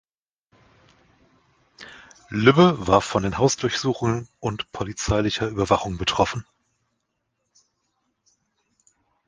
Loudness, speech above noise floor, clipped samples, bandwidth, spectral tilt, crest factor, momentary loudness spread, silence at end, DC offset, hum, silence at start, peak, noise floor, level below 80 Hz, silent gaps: -22 LUFS; 55 dB; under 0.1%; 10 kHz; -5 dB/octave; 22 dB; 14 LU; 2.85 s; under 0.1%; none; 1.8 s; -2 dBFS; -76 dBFS; -46 dBFS; none